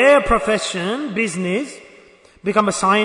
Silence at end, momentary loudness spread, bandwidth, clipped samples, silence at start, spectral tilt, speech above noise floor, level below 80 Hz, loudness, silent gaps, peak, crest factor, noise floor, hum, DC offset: 0 s; 12 LU; 11 kHz; under 0.1%; 0 s; -4 dB/octave; 30 dB; -38 dBFS; -19 LUFS; none; -2 dBFS; 16 dB; -48 dBFS; none; under 0.1%